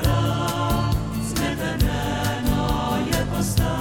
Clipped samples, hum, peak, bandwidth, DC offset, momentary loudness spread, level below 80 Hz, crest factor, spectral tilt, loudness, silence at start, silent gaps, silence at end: under 0.1%; none; -6 dBFS; 17.5 kHz; under 0.1%; 2 LU; -30 dBFS; 16 dB; -5.5 dB/octave; -23 LUFS; 0 s; none; 0 s